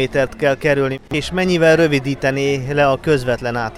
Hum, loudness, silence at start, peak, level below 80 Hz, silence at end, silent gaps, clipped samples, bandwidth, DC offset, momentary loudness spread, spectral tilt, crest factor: none; -17 LUFS; 0 s; -2 dBFS; -40 dBFS; 0 s; none; under 0.1%; 15 kHz; under 0.1%; 7 LU; -6 dB/octave; 16 dB